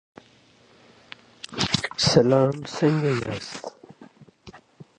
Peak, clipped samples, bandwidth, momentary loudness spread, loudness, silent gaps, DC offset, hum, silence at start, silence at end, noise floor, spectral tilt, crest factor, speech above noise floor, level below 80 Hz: -4 dBFS; under 0.1%; 10.5 kHz; 23 LU; -22 LUFS; none; under 0.1%; none; 1.5 s; 0.15 s; -56 dBFS; -5 dB/octave; 22 dB; 35 dB; -54 dBFS